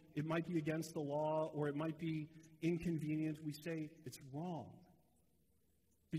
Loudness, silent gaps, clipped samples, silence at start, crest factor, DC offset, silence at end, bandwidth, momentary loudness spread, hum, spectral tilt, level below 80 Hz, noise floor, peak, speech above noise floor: -43 LUFS; none; under 0.1%; 0 s; 16 dB; under 0.1%; 0 s; 15.5 kHz; 11 LU; none; -7 dB/octave; -74 dBFS; -79 dBFS; -26 dBFS; 36 dB